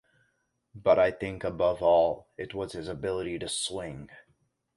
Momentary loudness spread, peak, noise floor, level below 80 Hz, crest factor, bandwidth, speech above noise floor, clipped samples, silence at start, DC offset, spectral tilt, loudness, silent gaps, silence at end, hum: 15 LU; -8 dBFS; -75 dBFS; -56 dBFS; 20 dB; 11.5 kHz; 47 dB; under 0.1%; 0.75 s; under 0.1%; -4 dB/octave; -28 LUFS; none; 0.6 s; none